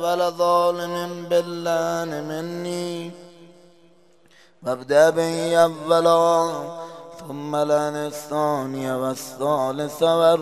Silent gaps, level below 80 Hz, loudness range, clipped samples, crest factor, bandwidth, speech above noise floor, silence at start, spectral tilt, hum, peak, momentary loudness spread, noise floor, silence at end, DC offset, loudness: none; -70 dBFS; 7 LU; under 0.1%; 20 dB; 15 kHz; 35 dB; 0 s; -5 dB/octave; none; -2 dBFS; 15 LU; -56 dBFS; 0 s; 0.1%; -22 LUFS